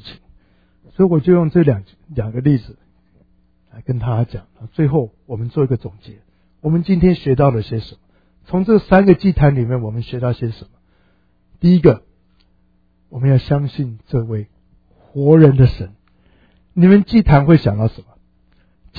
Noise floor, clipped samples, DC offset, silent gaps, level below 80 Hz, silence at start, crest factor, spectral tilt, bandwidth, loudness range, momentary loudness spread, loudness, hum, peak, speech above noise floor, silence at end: -58 dBFS; under 0.1%; under 0.1%; none; -34 dBFS; 0.05 s; 16 dB; -11.5 dB/octave; 5 kHz; 8 LU; 17 LU; -15 LUFS; none; 0 dBFS; 44 dB; 0.95 s